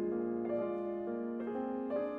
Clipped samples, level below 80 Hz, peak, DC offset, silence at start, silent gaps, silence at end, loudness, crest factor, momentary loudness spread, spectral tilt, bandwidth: under 0.1%; -72 dBFS; -26 dBFS; under 0.1%; 0 s; none; 0 s; -38 LUFS; 12 dB; 3 LU; -10 dB/octave; 4.3 kHz